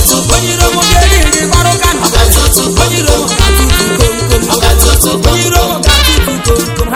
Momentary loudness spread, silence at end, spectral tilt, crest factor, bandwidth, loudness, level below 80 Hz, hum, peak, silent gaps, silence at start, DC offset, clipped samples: 3 LU; 0 s; -3.5 dB/octave; 8 dB; over 20 kHz; -8 LUFS; -12 dBFS; none; 0 dBFS; none; 0 s; under 0.1%; 3%